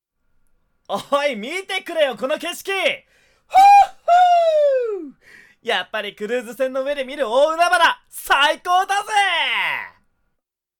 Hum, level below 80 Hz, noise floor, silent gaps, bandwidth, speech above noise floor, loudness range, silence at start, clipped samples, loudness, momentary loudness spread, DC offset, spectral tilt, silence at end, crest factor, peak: none; -58 dBFS; -76 dBFS; none; 19 kHz; 58 dB; 6 LU; 0.9 s; under 0.1%; -18 LUFS; 14 LU; under 0.1%; -1.5 dB/octave; 0.9 s; 14 dB; -6 dBFS